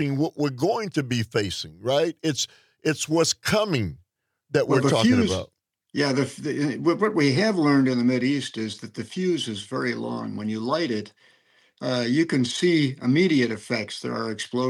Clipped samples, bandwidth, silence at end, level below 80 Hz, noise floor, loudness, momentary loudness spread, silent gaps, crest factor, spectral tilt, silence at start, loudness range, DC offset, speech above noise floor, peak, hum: under 0.1%; 15 kHz; 0 s; -64 dBFS; -68 dBFS; -24 LUFS; 10 LU; none; 18 dB; -5 dB/octave; 0 s; 4 LU; under 0.1%; 45 dB; -6 dBFS; none